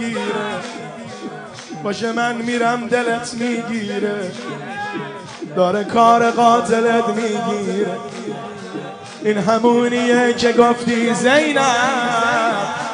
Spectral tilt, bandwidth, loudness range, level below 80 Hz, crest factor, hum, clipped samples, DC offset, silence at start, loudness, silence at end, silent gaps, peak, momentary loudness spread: -4.5 dB/octave; 10.5 kHz; 6 LU; -60 dBFS; 16 dB; none; under 0.1%; under 0.1%; 0 s; -17 LUFS; 0 s; none; 0 dBFS; 16 LU